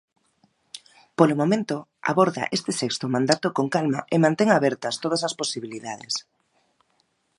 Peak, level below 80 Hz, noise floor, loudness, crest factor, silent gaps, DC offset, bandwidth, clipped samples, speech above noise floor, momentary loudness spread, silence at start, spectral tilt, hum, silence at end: 0 dBFS; -70 dBFS; -69 dBFS; -23 LUFS; 24 dB; none; under 0.1%; 11.5 kHz; under 0.1%; 46 dB; 14 LU; 0.75 s; -5 dB/octave; none; 1.15 s